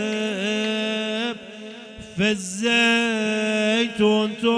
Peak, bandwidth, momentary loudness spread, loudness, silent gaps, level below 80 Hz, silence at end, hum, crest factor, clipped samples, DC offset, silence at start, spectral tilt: -8 dBFS; 10 kHz; 17 LU; -21 LUFS; none; -58 dBFS; 0 s; none; 16 dB; under 0.1%; under 0.1%; 0 s; -4 dB/octave